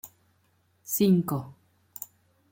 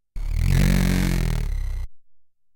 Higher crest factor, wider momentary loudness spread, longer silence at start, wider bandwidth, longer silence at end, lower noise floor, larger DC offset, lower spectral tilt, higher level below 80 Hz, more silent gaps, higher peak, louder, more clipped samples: about the same, 18 dB vs 14 dB; first, 25 LU vs 14 LU; about the same, 0.05 s vs 0.15 s; second, 17 kHz vs 19 kHz; first, 1 s vs 0.35 s; first, -68 dBFS vs -50 dBFS; neither; about the same, -6.5 dB/octave vs -6 dB/octave; second, -68 dBFS vs -24 dBFS; neither; second, -12 dBFS vs -8 dBFS; second, -26 LUFS vs -23 LUFS; neither